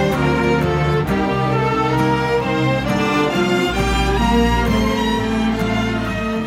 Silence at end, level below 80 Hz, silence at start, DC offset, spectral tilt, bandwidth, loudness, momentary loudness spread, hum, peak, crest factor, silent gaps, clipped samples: 0 s; -28 dBFS; 0 s; under 0.1%; -6 dB/octave; 16 kHz; -17 LUFS; 3 LU; none; -4 dBFS; 12 dB; none; under 0.1%